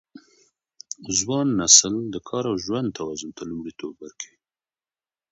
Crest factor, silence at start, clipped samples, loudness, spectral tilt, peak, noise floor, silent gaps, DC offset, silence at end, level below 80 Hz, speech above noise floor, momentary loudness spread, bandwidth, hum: 26 dB; 0.15 s; under 0.1%; -20 LUFS; -2.5 dB/octave; 0 dBFS; under -90 dBFS; none; under 0.1%; 1.05 s; -58 dBFS; over 67 dB; 24 LU; 8.2 kHz; none